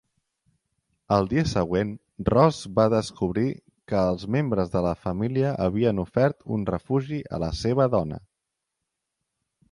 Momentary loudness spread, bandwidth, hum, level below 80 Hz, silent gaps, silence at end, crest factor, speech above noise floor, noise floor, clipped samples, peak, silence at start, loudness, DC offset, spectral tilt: 8 LU; 11.5 kHz; none; -46 dBFS; none; 1.55 s; 20 dB; 59 dB; -83 dBFS; under 0.1%; -4 dBFS; 1.1 s; -25 LUFS; under 0.1%; -7.5 dB/octave